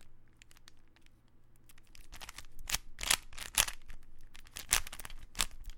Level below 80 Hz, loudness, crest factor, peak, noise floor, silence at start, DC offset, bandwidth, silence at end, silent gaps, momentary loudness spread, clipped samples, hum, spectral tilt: -48 dBFS; -34 LUFS; 34 dB; -6 dBFS; -59 dBFS; 0 s; under 0.1%; 17 kHz; 0 s; none; 18 LU; under 0.1%; none; 0.5 dB/octave